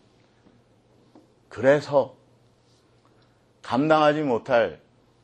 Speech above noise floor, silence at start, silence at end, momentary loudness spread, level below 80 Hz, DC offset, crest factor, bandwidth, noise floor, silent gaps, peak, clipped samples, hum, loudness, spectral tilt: 39 dB; 1.5 s; 0.5 s; 14 LU; -68 dBFS; under 0.1%; 20 dB; 8.8 kHz; -60 dBFS; none; -6 dBFS; under 0.1%; none; -22 LUFS; -6.5 dB/octave